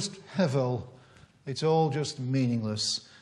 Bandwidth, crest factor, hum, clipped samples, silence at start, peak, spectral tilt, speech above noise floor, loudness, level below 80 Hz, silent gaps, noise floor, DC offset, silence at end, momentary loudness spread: 11.5 kHz; 16 dB; none; under 0.1%; 0 s; -12 dBFS; -5.5 dB/octave; 28 dB; -29 LUFS; -68 dBFS; none; -56 dBFS; under 0.1%; 0.15 s; 11 LU